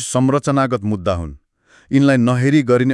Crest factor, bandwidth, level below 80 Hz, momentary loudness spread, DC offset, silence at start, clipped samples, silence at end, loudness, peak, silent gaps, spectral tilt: 14 dB; 12 kHz; -44 dBFS; 8 LU; under 0.1%; 0 s; under 0.1%; 0 s; -16 LUFS; -2 dBFS; none; -6.5 dB/octave